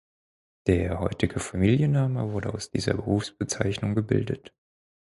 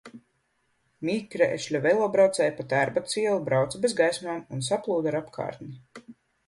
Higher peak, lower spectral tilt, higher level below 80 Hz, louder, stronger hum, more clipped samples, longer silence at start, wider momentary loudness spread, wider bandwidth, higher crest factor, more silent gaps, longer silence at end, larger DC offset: about the same, -8 dBFS vs -8 dBFS; first, -6 dB/octave vs -4.5 dB/octave; first, -44 dBFS vs -66 dBFS; about the same, -27 LUFS vs -26 LUFS; neither; neither; first, 0.65 s vs 0.05 s; second, 8 LU vs 13 LU; about the same, 11.5 kHz vs 11.5 kHz; about the same, 20 dB vs 18 dB; neither; first, 0.6 s vs 0.35 s; neither